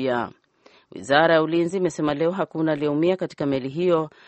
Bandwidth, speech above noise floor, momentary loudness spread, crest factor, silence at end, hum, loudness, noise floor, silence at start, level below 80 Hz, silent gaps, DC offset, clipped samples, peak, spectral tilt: 8.4 kHz; 34 dB; 8 LU; 20 dB; 0.2 s; none; -22 LUFS; -56 dBFS; 0 s; -60 dBFS; none; under 0.1%; under 0.1%; -2 dBFS; -6 dB/octave